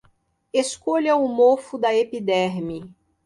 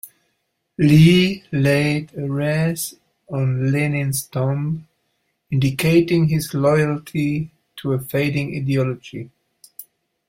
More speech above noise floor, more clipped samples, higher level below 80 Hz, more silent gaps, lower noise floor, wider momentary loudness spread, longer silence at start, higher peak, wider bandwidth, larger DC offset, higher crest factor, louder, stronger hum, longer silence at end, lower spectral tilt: second, 41 dB vs 54 dB; neither; second, -62 dBFS vs -50 dBFS; neither; second, -62 dBFS vs -72 dBFS; second, 10 LU vs 15 LU; first, 0.55 s vs 0.05 s; second, -6 dBFS vs -2 dBFS; second, 11.5 kHz vs 16.5 kHz; neither; about the same, 16 dB vs 18 dB; about the same, -21 LUFS vs -19 LUFS; neither; about the same, 0.35 s vs 0.45 s; second, -4.5 dB/octave vs -6.5 dB/octave